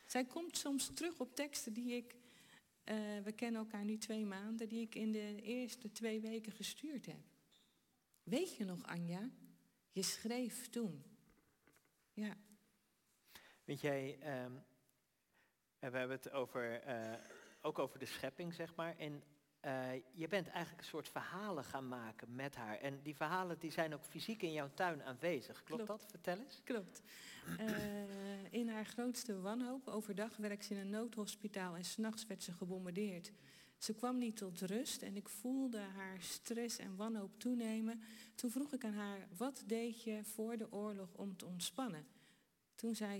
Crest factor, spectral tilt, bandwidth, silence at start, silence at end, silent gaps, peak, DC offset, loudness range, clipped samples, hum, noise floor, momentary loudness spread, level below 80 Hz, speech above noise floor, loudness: 20 dB; -4 dB/octave; 16.5 kHz; 0 s; 0 s; none; -26 dBFS; under 0.1%; 3 LU; under 0.1%; none; -82 dBFS; 9 LU; -84 dBFS; 37 dB; -45 LUFS